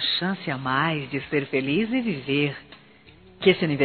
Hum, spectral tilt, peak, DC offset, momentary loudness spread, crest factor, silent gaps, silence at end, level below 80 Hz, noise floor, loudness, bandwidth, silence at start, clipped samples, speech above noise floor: none; -3.5 dB/octave; -4 dBFS; under 0.1%; 7 LU; 20 dB; none; 0 s; -60 dBFS; -52 dBFS; -24 LUFS; 4.6 kHz; 0 s; under 0.1%; 28 dB